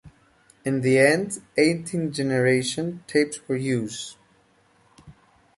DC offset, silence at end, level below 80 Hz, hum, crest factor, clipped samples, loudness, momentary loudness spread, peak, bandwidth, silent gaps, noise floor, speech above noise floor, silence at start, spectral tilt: under 0.1%; 0.45 s; -62 dBFS; none; 22 dB; under 0.1%; -23 LUFS; 12 LU; -4 dBFS; 11.5 kHz; none; -61 dBFS; 38 dB; 0.05 s; -5 dB/octave